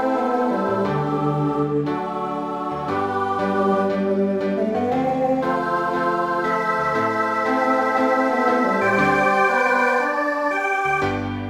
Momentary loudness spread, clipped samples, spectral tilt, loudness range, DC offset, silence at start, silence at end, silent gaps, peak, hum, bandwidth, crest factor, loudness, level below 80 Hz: 6 LU; under 0.1%; -6.5 dB/octave; 4 LU; under 0.1%; 0 s; 0 s; none; -6 dBFS; none; 15.5 kHz; 14 dB; -20 LUFS; -54 dBFS